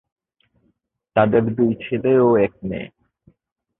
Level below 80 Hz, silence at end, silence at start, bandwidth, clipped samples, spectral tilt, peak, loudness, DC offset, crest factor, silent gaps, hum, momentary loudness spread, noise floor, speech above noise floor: -54 dBFS; 0.95 s; 1.15 s; 4 kHz; under 0.1%; -12.5 dB/octave; -2 dBFS; -19 LUFS; under 0.1%; 20 dB; none; none; 14 LU; -68 dBFS; 50 dB